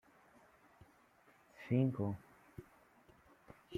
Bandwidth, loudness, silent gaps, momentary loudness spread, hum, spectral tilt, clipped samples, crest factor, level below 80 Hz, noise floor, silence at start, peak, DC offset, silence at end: 7 kHz; -38 LUFS; none; 25 LU; none; -9.5 dB/octave; under 0.1%; 20 dB; -76 dBFS; -69 dBFS; 1.6 s; -22 dBFS; under 0.1%; 0 s